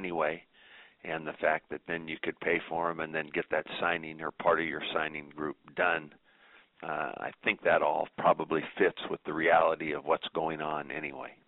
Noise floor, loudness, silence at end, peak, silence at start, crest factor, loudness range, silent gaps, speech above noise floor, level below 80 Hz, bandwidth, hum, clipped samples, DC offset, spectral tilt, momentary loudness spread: -61 dBFS; -31 LUFS; 0.15 s; -10 dBFS; 0 s; 22 dB; 5 LU; none; 29 dB; -68 dBFS; 4.1 kHz; none; under 0.1%; under 0.1%; -2.5 dB/octave; 11 LU